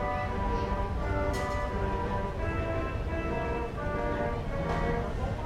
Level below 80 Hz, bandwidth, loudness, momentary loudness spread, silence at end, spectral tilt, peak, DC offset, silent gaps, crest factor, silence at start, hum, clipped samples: -36 dBFS; 12.5 kHz; -32 LUFS; 3 LU; 0 s; -7 dB/octave; -18 dBFS; under 0.1%; none; 14 dB; 0 s; none; under 0.1%